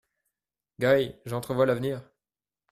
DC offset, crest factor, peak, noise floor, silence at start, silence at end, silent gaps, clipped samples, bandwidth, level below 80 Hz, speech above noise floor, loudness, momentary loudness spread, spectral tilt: under 0.1%; 18 dB; -10 dBFS; under -90 dBFS; 0.8 s; 0.7 s; none; under 0.1%; 14.5 kHz; -62 dBFS; over 64 dB; -27 LUFS; 11 LU; -6.5 dB/octave